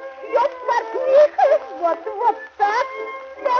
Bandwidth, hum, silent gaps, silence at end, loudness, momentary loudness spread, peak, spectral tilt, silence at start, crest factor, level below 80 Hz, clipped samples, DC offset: 6.8 kHz; none; none; 0 s; -19 LUFS; 11 LU; -4 dBFS; -2.5 dB/octave; 0 s; 16 dB; -68 dBFS; under 0.1%; under 0.1%